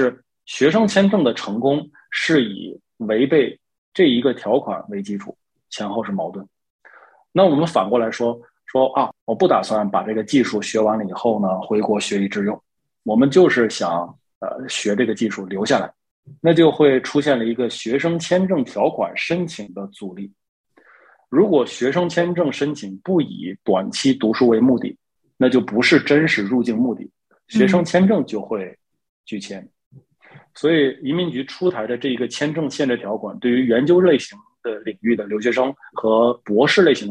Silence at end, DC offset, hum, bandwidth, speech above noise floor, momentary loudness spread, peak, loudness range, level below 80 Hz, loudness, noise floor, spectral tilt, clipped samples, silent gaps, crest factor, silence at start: 0 s; under 0.1%; none; 10.5 kHz; 34 dB; 15 LU; -2 dBFS; 5 LU; -64 dBFS; -19 LUFS; -52 dBFS; -5.5 dB/octave; under 0.1%; 3.78-3.92 s, 6.70-6.79 s, 9.21-9.27 s, 14.35-14.41 s, 16.11-16.23 s, 20.49-20.64 s, 29.09-29.24 s, 29.86-29.91 s; 18 dB; 0 s